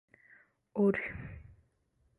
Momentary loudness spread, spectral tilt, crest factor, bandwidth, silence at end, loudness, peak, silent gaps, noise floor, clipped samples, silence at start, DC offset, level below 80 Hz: 19 LU; -10 dB/octave; 18 dB; 3.9 kHz; 0.65 s; -33 LUFS; -18 dBFS; none; -74 dBFS; under 0.1%; 0.75 s; under 0.1%; -60 dBFS